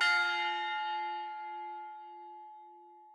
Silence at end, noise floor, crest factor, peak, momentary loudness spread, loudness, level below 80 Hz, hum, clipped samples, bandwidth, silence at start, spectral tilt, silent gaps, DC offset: 0 s; -55 dBFS; 20 dB; -16 dBFS; 23 LU; -34 LUFS; under -90 dBFS; none; under 0.1%; 12 kHz; 0 s; 1.5 dB/octave; none; under 0.1%